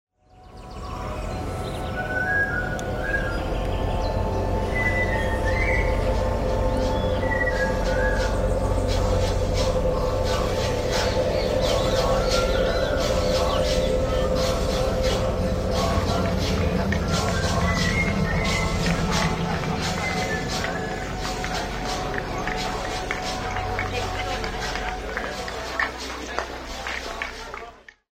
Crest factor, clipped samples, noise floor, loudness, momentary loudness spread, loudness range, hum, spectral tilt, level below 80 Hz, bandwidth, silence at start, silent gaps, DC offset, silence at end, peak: 18 dB; under 0.1%; -48 dBFS; -24 LUFS; 8 LU; 5 LU; none; -5 dB/octave; -30 dBFS; 16 kHz; 0.35 s; none; under 0.1%; 0.35 s; -6 dBFS